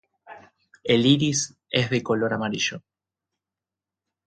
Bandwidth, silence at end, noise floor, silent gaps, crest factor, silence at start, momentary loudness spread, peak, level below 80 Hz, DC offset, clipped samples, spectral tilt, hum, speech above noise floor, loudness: 9.2 kHz; 1.5 s; -89 dBFS; none; 22 dB; 0.3 s; 8 LU; -4 dBFS; -64 dBFS; under 0.1%; under 0.1%; -4 dB/octave; none; 67 dB; -23 LUFS